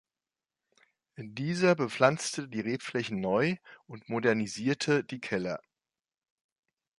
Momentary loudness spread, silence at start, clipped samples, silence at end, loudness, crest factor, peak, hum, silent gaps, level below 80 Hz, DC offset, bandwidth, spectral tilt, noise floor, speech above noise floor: 14 LU; 1.2 s; under 0.1%; 1.4 s; -30 LUFS; 22 dB; -10 dBFS; none; none; -70 dBFS; under 0.1%; 11.5 kHz; -5 dB/octave; under -90 dBFS; over 60 dB